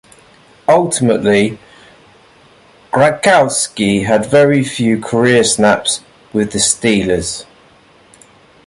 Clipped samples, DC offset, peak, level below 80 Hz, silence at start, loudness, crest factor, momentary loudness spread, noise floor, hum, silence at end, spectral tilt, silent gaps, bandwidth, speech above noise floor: under 0.1%; under 0.1%; 0 dBFS; -46 dBFS; 0.7 s; -13 LUFS; 14 dB; 9 LU; -46 dBFS; none; 1.25 s; -4 dB/octave; none; 11.5 kHz; 34 dB